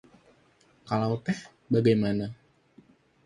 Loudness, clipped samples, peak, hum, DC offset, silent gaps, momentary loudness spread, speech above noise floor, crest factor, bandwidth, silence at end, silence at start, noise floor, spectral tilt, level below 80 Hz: -28 LUFS; under 0.1%; -12 dBFS; none; under 0.1%; none; 11 LU; 37 dB; 18 dB; 11 kHz; 0.9 s; 0.85 s; -63 dBFS; -7.5 dB/octave; -62 dBFS